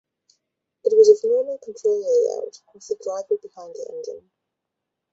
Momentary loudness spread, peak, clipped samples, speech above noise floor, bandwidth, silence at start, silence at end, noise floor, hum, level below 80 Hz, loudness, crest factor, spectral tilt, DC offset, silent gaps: 22 LU; -2 dBFS; under 0.1%; 61 dB; 7.8 kHz; 0.85 s; 0.95 s; -82 dBFS; none; -74 dBFS; -20 LUFS; 20 dB; -3.5 dB/octave; under 0.1%; none